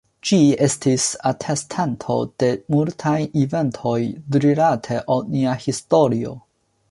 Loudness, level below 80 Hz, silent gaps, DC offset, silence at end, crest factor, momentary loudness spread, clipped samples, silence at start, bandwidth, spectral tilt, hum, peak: -20 LUFS; -56 dBFS; none; under 0.1%; 0.5 s; 16 dB; 8 LU; under 0.1%; 0.25 s; 11.5 kHz; -5.5 dB/octave; none; -4 dBFS